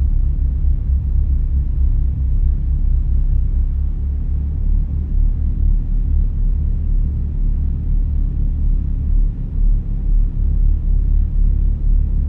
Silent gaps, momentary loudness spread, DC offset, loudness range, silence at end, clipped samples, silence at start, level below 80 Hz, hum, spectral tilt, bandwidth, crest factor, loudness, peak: none; 3 LU; under 0.1%; 2 LU; 0 s; under 0.1%; 0 s; -16 dBFS; none; -12 dB/octave; 1 kHz; 10 dB; -20 LUFS; -6 dBFS